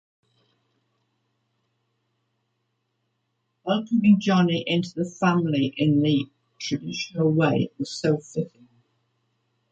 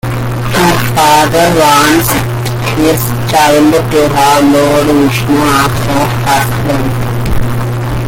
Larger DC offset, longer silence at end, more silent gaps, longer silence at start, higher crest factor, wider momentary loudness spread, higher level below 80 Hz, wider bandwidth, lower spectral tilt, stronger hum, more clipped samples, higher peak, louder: neither; first, 1.25 s vs 0 s; neither; first, 3.65 s vs 0.05 s; first, 18 dB vs 8 dB; first, 12 LU vs 8 LU; second, -66 dBFS vs -26 dBFS; second, 8.4 kHz vs 17.5 kHz; first, -6.5 dB/octave vs -5 dB/octave; neither; neither; second, -8 dBFS vs 0 dBFS; second, -23 LUFS vs -9 LUFS